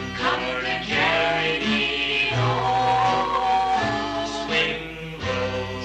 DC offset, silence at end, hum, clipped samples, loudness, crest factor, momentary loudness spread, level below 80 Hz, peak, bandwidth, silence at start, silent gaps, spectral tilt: under 0.1%; 0 s; none; under 0.1%; -22 LUFS; 16 dB; 7 LU; -46 dBFS; -8 dBFS; 9.6 kHz; 0 s; none; -4.5 dB/octave